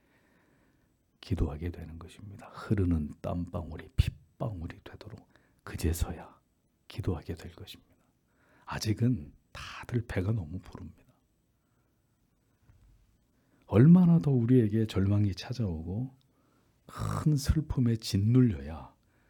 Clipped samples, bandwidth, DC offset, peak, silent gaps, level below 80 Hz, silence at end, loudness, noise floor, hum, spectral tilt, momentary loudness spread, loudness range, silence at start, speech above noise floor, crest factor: under 0.1%; 18 kHz; under 0.1%; -10 dBFS; none; -46 dBFS; 0.4 s; -29 LUFS; -72 dBFS; none; -7.5 dB/octave; 23 LU; 13 LU; 1.25 s; 44 dB; 20 dB